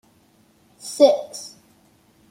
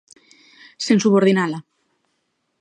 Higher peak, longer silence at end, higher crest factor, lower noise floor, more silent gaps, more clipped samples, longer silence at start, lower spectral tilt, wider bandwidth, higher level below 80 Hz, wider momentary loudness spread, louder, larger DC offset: about the same, -2 dBFS vs -4 dBFS; second, 0.85 s vs 1 s; about the same, 22 dB vs 18 dB; second, -58 dBFS vs -71 dBFS; neither; neither; about the same, 0.85 s vs 0.8 s; second, -3 dB/octave vs -5.5 dB/octave; first, 15.5 kHz vs 9.8 kHz; about the same, -72 dBFS vs -72 dBFS; first, 22 LU vs 14 LU; about the same, -18 LUFS vs -18 LUFS; neither